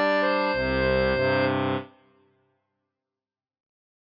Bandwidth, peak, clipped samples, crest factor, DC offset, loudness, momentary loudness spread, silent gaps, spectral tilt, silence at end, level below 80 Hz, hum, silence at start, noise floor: 5.6 kHz; -12 dBFS; under 0.1%; 14 dB; under 0.1%; -24 LUFS; 5 LU; none; -7.5 dB/octave; 2.2 s; -44 dBFS; none; 0 s; under -90 dBFS